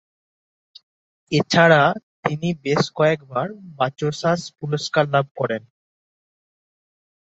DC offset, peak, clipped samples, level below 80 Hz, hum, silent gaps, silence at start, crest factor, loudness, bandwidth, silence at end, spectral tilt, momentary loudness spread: under 0.1%; -2 dBFS; under 0.1%; -60 dBFS; none; 2.03-2.23 s, 5.31-5.35 s; 1.3 s; 20 dB; -20 LUFS; 8 kHz; 1.65 s; -5.5 dB/octave; 12 LU